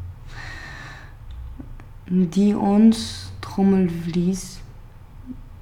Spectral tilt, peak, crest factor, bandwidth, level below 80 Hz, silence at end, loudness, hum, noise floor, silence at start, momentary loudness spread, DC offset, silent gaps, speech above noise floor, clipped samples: -7 dB/octave; -6 dBFS; 16 dB; 13 kHz; -40 dBFS; 0 s; -20 LUFS; none; -41 dBFS; 0 s; 24 LU; under 0.1%; none; 23 dB; under 0.1%